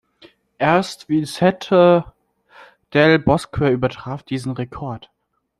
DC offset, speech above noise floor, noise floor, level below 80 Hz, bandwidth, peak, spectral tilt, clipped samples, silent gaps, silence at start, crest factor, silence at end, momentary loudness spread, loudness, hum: under 0.1%; 34 dB; -51 dBFS; -46 dBFS; 13 kHz; -2 dBFS; -6.5 dB/octave; under 0.1%; none; 0.6 s; 18 dB; 0.6 s; 16 LU; -18 LUFS; none